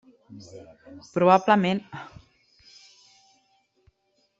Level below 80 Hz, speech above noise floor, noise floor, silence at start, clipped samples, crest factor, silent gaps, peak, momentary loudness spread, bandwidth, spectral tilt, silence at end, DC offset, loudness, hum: -68 dBFS; 47 dB; -71 dBFS; 0.3 s; under 0.1%; 24 dB; none; -4 dBFS; 28 LU; 7.8 kHz; -6.5 dB/octave; 2.35 s; under 0.1%; -22 LUFS; none